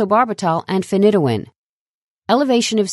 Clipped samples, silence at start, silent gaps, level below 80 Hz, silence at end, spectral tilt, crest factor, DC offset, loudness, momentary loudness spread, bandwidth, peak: under 0.1%; 0 s; 1.56-2.22 s; -64 dBFS; 0 s; -5.5 dB/octave; 16 dB; under 0.1%; -17 LUFS; 6 LU; 12 kHz; -2 dBFS